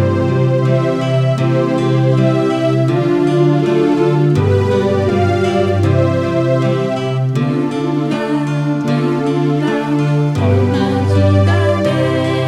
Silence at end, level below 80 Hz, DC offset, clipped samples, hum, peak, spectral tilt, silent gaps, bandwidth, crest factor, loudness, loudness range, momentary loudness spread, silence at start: 0 s; -50 dBFS; under 0.1%; under 0.1%; none; 0 dBFS; -8 dB/octave; none; 10.5 kHz; 12 dB; -14 LUFS; 3 LU; 4 LU; 0 s